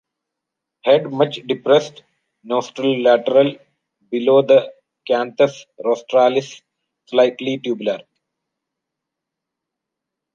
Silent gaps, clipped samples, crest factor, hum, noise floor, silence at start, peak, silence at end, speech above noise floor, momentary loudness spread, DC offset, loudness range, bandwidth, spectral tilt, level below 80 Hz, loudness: none; under 0.1%; 18 dB; none; -82 dBFS; 0.85 s; -2 dBFS; 2.35 s; 66 dB; 11 LU; under 0.1%; 7 LU; 7.2 kHz; -5.5 dB/octave; -72 dBFS; -18 LUFS